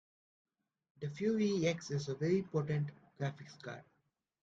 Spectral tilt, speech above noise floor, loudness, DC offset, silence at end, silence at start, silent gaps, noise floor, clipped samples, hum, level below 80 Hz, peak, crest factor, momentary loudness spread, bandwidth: -6.5 dB/octave; 45 dB; -37 LUFS; under 0.1%; 0.6 s; 1 s; none; -81 dBFS; under 0.1%; none; -74 dBFS; -20 dBFS; 18 dB; 16 LU; 7.8 kHz